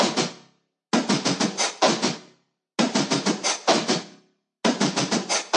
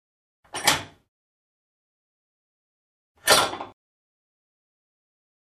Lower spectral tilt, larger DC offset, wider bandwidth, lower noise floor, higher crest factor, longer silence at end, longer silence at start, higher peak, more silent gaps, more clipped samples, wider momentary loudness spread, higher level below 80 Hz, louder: first, -3 dB/octave vs -0.5 dB/octave; neither; second, 11 kHz vs 13.5 kHz; second, -62 dBFS vs under -90 dBFS; second, 20 dB vs 28 dB; second, 0 s vs 1.85 s; second, 0 s vs 0.55 s; about the same, -4 dBFS vs -2 dBFS; second, none vs 1.08-3.15 s; neither; second, 6 LU vs 19 LU; second, -76 dBFS vs -62 dBFS; about the same, -23 LUFS vs -21 LUFS